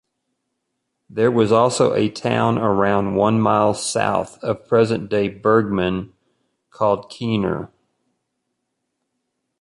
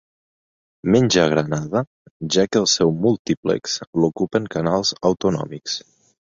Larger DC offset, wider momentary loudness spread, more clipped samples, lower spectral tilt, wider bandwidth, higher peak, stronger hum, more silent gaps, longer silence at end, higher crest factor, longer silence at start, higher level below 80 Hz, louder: neither; about the same, 9 LU vs 11 LU; neither; first, -6 dB/octave vs -4.5 dB/octave; first, 11.5 kHz vs 7.8 kHz; about the same, -2 dBFS vs -2 dBFS; neither; second, none vs 1.87-2.05 s, 2.11-2.20 s, 3.19-3.25 s, 3.37-3.43 s, 3.87-3.93 s; first, 1.95 s vs 0.6 s; about the same, 18 dB vs 18 dB; first, 1.1 s vs 0.85 s; about the same, -52 dBFS vs -52 dBFS; about the same, -19 LUFS vs -20 LUFS